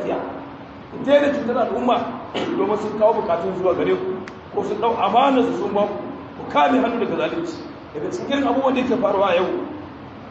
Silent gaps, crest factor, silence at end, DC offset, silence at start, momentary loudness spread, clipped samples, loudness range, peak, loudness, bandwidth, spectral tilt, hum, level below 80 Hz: none; 18 dB; 0 s; under 0.1%; 0 s; 16 LU; under 0.1%; 2 LU; -4 dBFS; -20 LUFS; 8 kHz; -6 dB/octave; none; -54 dBFS